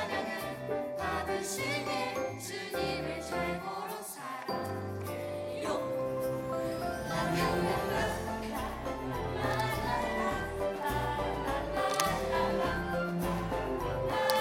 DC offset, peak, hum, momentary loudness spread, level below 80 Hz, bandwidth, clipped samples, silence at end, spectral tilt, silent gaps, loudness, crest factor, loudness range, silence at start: under 0.1%; -8 dBFS; none; 7 LU; -48 dBFS; 17.5 kHz; under 0.1%; 0 s; -4.5 dB/octave; none; -34 LUFS; 26 dB; 4 LU; 0 s